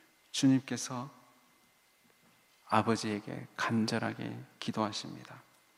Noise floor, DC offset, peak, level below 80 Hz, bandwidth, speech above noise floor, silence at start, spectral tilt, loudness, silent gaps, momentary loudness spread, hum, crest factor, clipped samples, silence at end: -68 dBFS; under 0.1%; -12 dBFS; -80 dBFS; 15 kHz; 34 dB; 0.35 s; -4.5 dB/octave; -34 LUFS; none; 15 LU; none; 24 dB; under 0.1%; 0.35 s